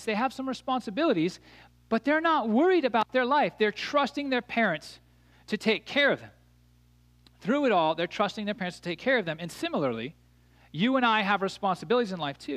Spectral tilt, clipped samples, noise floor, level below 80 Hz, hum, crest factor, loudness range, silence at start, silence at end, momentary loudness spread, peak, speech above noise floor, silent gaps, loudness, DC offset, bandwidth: -5.5 dB/octave; under 0.1%; -61 dBFS; -66 dBFS; 60 Hz at -55 dBFS; 18 dB; 4 LU; 0 s; 0 s; 10 LU; -10 dBFS; 33 dB; none; -27 LUFS; under 0.1%; 14.5 kHz